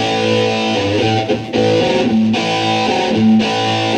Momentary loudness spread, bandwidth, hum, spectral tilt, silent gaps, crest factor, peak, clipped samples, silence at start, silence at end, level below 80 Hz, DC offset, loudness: 3 LU; 9.6 kHz; none; -5 dB/octave; none; 12 dB; -2 dBFS; under 0.1%; 0 s; 0 s; -48 dBFS; under 0.1%; -14 LUFS